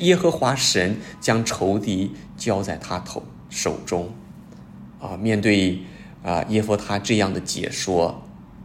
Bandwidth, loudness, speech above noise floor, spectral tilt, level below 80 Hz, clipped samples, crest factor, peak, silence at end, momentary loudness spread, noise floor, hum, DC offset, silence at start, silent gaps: 16 kHz; -22 LUFS; 20 dB; -4.5 dB/octave; -52 dBFS; under 0.1%; 20 dB; -4 dBFS; 0 s; 20 LU; -42 dBFS; none; under 0.1%; 0 s; none